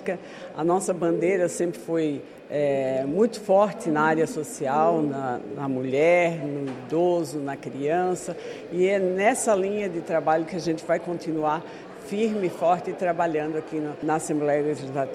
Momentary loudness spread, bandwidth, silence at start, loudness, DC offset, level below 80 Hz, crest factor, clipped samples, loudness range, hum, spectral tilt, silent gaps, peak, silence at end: 10 LU; 14 kHz; 0 s; -25 LUFS; under 0.1%; -66 dBFS; 16 dB; under 0.1%; 3 LU; none; -5.5 dB/octave; none; -8 dBFS; 0 s